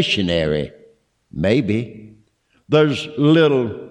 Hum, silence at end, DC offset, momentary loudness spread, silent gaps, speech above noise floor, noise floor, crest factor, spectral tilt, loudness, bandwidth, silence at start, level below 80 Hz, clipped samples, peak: none; 0 s; under 0.1%; 12 LU; none; 42 dB; -60 dBFS; 14 dB; -6.5 dB/octave; -18 LUFS; 10 kHz; 0 s; -46 dBFS; under 0.1%; -4 dBFS